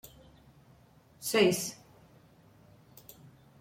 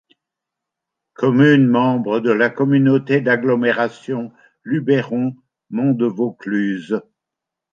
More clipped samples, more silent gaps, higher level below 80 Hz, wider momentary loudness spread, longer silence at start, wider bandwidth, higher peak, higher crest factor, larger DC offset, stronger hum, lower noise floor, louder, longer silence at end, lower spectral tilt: neither; neither; about the same, -68 dBFS vs -68 dBFS; first, 27 LU vs 12 LU; about the same, 1.2 s vs 1.2 s; first, 16.5 kHz vs 7.2 kHz; second, -12 dBFS vs -2 dBFS; first, 24 dB vs 16 dB; neither; neither; second, -61 dBFS vs -84 dBFS; second, -29 LUFS vs -17 LUFS; first, 1.85 s vs 0.7 s; second, -3.5 dB/octave vs -8.5 dB/octave